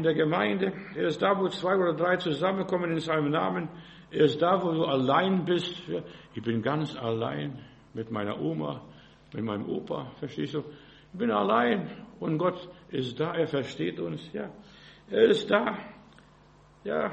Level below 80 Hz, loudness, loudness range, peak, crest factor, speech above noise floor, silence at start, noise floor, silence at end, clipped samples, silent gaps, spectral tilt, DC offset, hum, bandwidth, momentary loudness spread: -64 dBFS; -28 LUFS; 7 LU; -8 dBFS; 20 dB; 29 dB; 0 s; -57 dBFS; 0 s; under 0.1%; none; -7 dB/octave; under 0.1%; none; 8.4 kHz; 15 LU